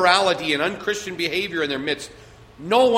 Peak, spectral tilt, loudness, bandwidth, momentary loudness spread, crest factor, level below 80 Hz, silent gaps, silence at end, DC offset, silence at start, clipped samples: -2 dBFS; -3 dB/octave; -22 LUFS; 16 kHz; 10 LU; 20 dB; -56 dBFS; none; 0 s; under 0.1%; 0 s; under 0.1%